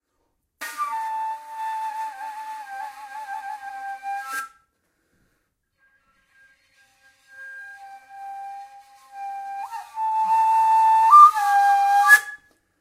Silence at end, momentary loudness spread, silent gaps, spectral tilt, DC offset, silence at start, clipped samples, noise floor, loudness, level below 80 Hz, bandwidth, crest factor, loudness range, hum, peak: 0.45 s; 25 LU; none; 1.5 dB/octave; under 0.1%; 0.6 s; under 0.1%; -73 dBFS; -18 LUFS; -74 dBFS; 16 kHz; 22 dB; 25 LU; none; -2 dBFS